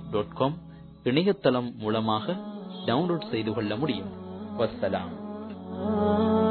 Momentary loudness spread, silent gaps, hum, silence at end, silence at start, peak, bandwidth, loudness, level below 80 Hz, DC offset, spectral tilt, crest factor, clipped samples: 14 LU; none; none; 0 s; 0 s; -8 dBFS; 4.5 kHz; -28 LUFS; -58 dBFS; under 0.1%; -10 dB/octave; 20 dB; under 0.1%